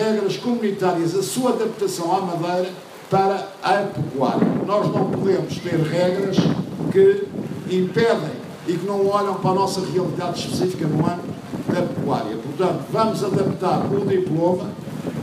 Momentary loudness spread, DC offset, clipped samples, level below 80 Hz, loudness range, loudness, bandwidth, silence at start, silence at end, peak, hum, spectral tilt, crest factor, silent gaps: 6 LU; under 0.1%; under 0.1%; -58 dBFS; 2 LU; -21 LUFS; 15.5 kHz; 0 s; 0 s; -4 dBFS; none; -6.5 dB/octave; 18 dB; none